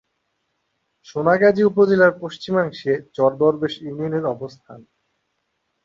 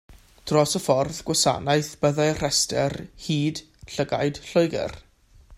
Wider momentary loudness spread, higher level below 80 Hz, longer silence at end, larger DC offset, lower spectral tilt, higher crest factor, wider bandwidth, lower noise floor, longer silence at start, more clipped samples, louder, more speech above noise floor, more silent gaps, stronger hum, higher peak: first, 14 LU vs 10 LU; second, -62 dBFS vs -50 dBFS; first, 1.05 s vs 0 s; neither; first, -7.5 dB/octave vs -4 dB/octave; about the same, 18 dB vs 20 dB; second, 7.4 kHz vs 15.5 kHz; first, -73 dBFS vs -51 dBFS; first, 1.1 s vs 0.1 s; neither; first, -19 LUFS vs -23 LUFS; first, 54 dB vs 28 dB; neither; neither; about the same, -2 dBFS vs -4 dBFS